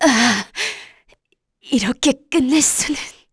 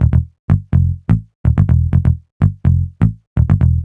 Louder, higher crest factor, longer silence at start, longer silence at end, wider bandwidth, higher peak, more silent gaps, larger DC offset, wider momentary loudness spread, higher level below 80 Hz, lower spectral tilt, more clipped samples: about the same, -17 LUFS vs -16 LUFS; about the same, 16 dB vs 12 dB; about the same, 0 s vs 0 s; first, 0.2 s vs 0 s; first, 11 kHz vs 3.1 kHz; about the same, -2 dBFS vs 0 dBFS; second, none vs 0.39-0.48 s, 1.35-1.44 s, 2.32-2.40 s, 3.27-3.36 s; neither; first, 10 LU vs 5 LU; second, -50 dBFS vs -22 dBFS; second, -2 dB/octave vs -11 dB/octave; neither